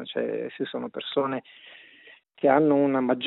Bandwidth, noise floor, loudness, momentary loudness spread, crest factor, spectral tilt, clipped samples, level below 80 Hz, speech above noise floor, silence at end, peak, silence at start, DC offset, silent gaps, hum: 4.1 kHz; -53 dBFS; -25 LUFS; 12 LU; 20 dB; -4 dB/octave; under 0.1%; -76 dBFS; 28 dB; 0 s; -6 dBFS; 0 s; under 0.1%; none; none